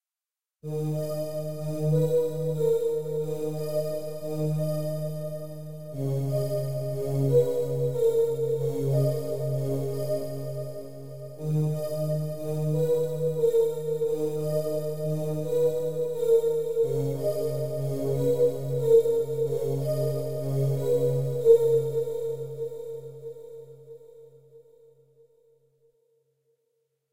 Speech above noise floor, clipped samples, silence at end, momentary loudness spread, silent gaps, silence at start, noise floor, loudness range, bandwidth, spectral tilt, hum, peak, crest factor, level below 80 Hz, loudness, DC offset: over 60 dB; under 0.1%; 0 s; 13 LU; none; 0 s; under -90 dBFS; 6 LU; 16 kHz; -8 dB/octave; none; -8 dBFS; 20 dB; -60 dBFS; -27 LUFS; 0.9%